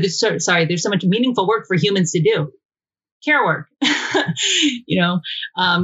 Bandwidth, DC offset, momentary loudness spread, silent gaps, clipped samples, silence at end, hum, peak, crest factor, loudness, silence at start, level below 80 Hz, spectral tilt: 8 kHz; under 0.1%; 4 LU; 2.65-2.69 s, 3.12-3.21 s; under 0.1%; 0 s; none; -2 dBFS; 16 dB; -18 LUFS; 0 s; -66 dBFS; -4 dB/octave